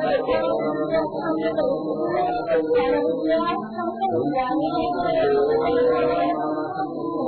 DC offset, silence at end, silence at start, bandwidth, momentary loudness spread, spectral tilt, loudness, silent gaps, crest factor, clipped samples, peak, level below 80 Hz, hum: under 0.1%; 0 s; 0 s; 4.6 kHz; 6 LU; -10 dB/octave; -22 LUFS; none; 12 dB; under 0.1%; -10 dBFS; -52 dBFS; none